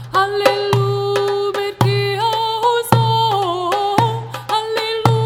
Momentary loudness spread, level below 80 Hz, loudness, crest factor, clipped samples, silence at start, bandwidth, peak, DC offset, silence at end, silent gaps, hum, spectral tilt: 5 LU; -50 dBFS; -17 LUFS; 16 dB; under 0.1%; 0 s; 16.5 kHz; 0 dBFS; under 0.1%; 0 s; none; none; -5.5 dB/octave